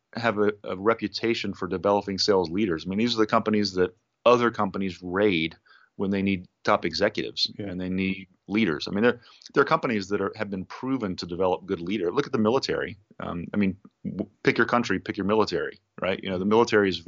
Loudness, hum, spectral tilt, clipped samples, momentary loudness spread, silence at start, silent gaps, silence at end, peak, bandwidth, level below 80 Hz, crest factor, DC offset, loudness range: -26 LUFS; none; -4 dB/octave; under 0.1%; 9 LU; 0.15 s; none; 0.05 s; -6 dBFS; 7.6 kHz; -60 dBFS; 20 dB; under 0.1%; 3 LU